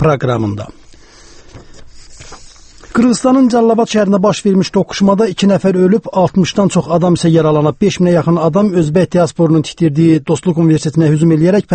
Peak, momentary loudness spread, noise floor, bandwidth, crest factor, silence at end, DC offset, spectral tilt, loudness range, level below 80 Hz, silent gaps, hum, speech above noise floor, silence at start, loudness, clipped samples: 0 dBFS; 4 LU; -38 dBFS; 8.8 kHz; 12 dB; 0 s; under 0.1%; -7 dB/octave; 4 LU; -42 dBFS; none; none; 27 dB; 0 s; -12 LUFS; under 0.1%